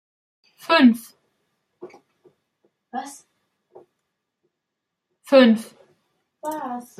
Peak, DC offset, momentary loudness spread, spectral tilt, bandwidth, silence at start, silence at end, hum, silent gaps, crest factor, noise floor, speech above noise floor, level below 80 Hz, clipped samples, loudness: -2 dBFS; under 0.1%; 23 LU; -5 dB/octave; 14.5 kHz; 0.7 s; 0.2 s; none; none; 22 dB; -82 dBFS; 64 dB; -76 dBFS; under 0.1%; -18 LUFS